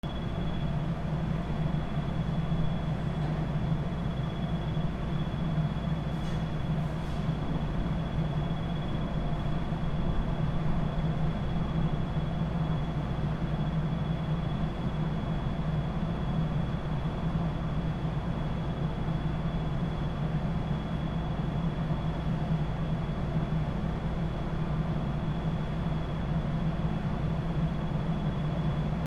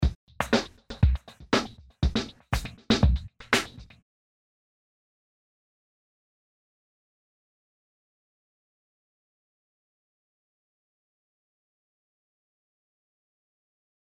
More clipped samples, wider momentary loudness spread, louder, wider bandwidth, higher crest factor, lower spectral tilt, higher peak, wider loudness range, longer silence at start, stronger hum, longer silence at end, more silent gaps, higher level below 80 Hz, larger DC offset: neither; second, 2 LU vs 11 LU; second, -32 LUFS vs -28 LUFS; second, 7.2 kHz vs 15 kHz; second, 14 dB vs 24 dB; first, -8.5 dB/octave vs -5 dB/octave; second, -16 dBFS vs -8 dBFS; second, 1 LU vs 7 LU; about the same, 0.05 s vs 0 s; neither; second, 0 s vs 10.2 s; second, none vs 0.15-0.27 s; about the same, -38 dBFS vs -36 dBFS; neither